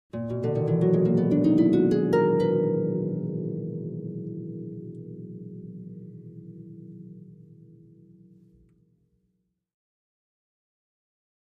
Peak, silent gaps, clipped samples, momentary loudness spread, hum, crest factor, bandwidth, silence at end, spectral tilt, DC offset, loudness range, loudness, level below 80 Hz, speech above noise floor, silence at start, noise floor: -10 dBFS; none; under 0.1%; 23 LU; none; 18 dB; 7 kHz; 4.1 s; -10 dB/octave; under 0.1%; 24 LU; -25 LUFS; -62 dBFS; 53 dB; 0.15 s; -75 dBFS